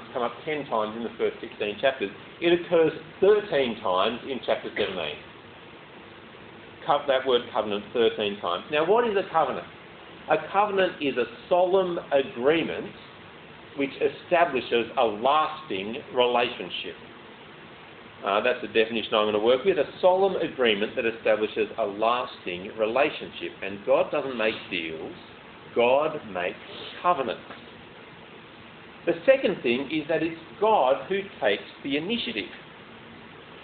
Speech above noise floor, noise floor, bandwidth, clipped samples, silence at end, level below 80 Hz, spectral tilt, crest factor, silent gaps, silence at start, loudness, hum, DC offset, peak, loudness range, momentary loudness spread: 21 dB; -46 dBFS; 4.6 kHz; under 0.1%; 0 s; -64 dBFS; -2 dB/octave; 20 dB; none; 0 s; -26 LUFS; none; under 0.1%; -6 dBFS; 4 LU; 23 LU